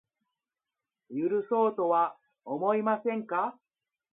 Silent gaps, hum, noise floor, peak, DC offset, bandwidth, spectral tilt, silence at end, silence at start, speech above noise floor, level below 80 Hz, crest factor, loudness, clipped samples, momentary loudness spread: none; none; under -90 dBFS; -14 dBFS; under 0.1%; 3.9 kHz; -10.5 dB/octave; 0.6 s; 1.1 s; over 62 dB; -86 dBFS; 18 dB; -29 LUFS; under 0.1%; 8 LU